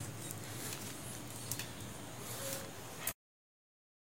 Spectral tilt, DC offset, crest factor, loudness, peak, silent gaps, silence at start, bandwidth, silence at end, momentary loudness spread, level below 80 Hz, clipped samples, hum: -3 dB/octave; 0.2%; 32 dB; -43 LUFS; -14 dBFS; none; 0 s; 17 kHz; 0.95 s; 6 LU; -68 dBFS; under 0.1%; none